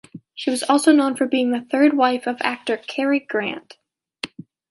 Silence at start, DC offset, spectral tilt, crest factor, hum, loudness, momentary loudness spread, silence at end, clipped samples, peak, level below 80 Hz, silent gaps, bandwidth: 0.15 s; under 0.1%; -3.5 dB/octave; 18 dB; none; -20 LUFS; 17 LU; 0.45 s; under 0.1%; -2 dBFS; -72 dBFS; none; 11.5 kHz